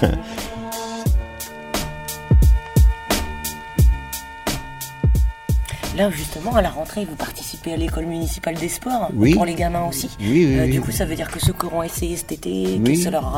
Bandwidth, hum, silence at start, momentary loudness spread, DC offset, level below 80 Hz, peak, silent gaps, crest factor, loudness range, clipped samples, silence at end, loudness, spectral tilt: 16.5 kHz; none; 0 s; 11 LU; under 0.1%; -24 dBFS; 0 dBFS; none; 20 dB; 4 LU; under 0.1%; 0 s; -21 LUFS; -5.5 dB/octave